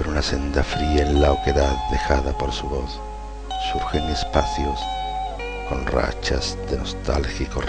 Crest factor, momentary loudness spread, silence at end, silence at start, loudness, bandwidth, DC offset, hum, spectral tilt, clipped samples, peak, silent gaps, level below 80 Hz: 20 dB; 9 LU; 0 s; 0 s; -23 LUFS; 9.4 kHz; under 0.1%; none; -5.5 dB/octave; under 0.1%; -2 dBFS; none; -26 dBFS